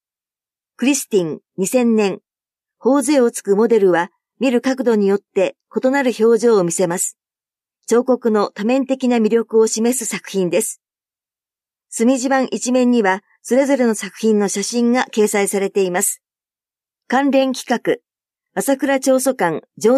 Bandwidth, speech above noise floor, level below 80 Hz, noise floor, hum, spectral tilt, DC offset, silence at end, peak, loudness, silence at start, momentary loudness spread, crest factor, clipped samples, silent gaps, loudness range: 15.5 kHz; over 74 dB; -72 dBFS; under -90 dBFS; none; -4 dB/octave; under 0.1%; 0 s; -4 dBFS; -17 LUFS; 0.8 s; 7 LU; 14 dB; under 0.1%; none; 3 LU